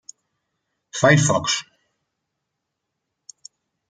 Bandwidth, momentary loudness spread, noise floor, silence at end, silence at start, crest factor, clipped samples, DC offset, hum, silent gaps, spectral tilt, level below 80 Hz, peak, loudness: 9.6 kHz; 11 LU; -80 dBFS; 2.3 s; 0.95 s; 22 dB; under 0.1%; under 0.1%; none; none; -4 dB/octave; -58 dBFS; -2 dBFS; -18 LUFS